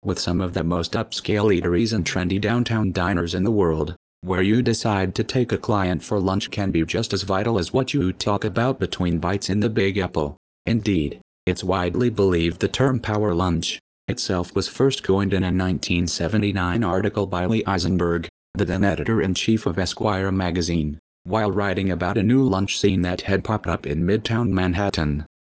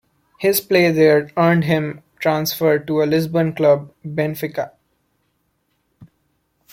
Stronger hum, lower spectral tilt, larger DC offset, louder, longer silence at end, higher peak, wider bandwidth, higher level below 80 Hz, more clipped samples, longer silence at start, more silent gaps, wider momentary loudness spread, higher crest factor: neither; about the same, -6 dB/octave vs -6 dB/octave; neither; second, -22 LUFS vs -18 LUFS; second, 0.25 s vs 0.65 s; second, -6 dBFS vs -2 dBFS; second, 8 kHz vs 16.5 kHz; first, -38 dBFS vs -58 dBFS; neither; second, 0.05 s vs 0.4 s; first, 3.96-4.22 s, 10.37-10.65 s, 11.21-11.47 s, 13.80-14.08 s, 18.29-18.54 s, 20.99-21.25 s vs none; second, 5 LU vs 11 LU; about the same, 16 dB vs 16 dB